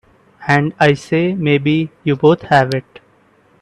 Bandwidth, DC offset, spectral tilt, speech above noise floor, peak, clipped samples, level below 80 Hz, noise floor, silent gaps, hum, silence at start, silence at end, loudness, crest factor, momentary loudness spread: 11 kHz; under 0.1%; -7 dB/octave; 38 dB; 0 dBFS; under 0.1%; -52 dBFS; -53 dBFS; none; none; 0.4 s; 0.8 s; -15 LUFS; 16 dB; 7 LU